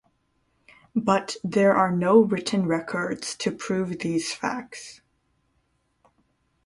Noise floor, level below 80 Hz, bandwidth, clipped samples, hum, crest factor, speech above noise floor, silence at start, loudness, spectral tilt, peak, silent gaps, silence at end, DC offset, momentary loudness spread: -70 dBFS; -64 dBFS; 11.5 kHz; under 0.1%; none; 20 dB; 47 dB; 0.95 s; -24 LUFS; -5.5 dB/octave; -6 dBFS; none; 1.7 s; under 0.1%; 12 LU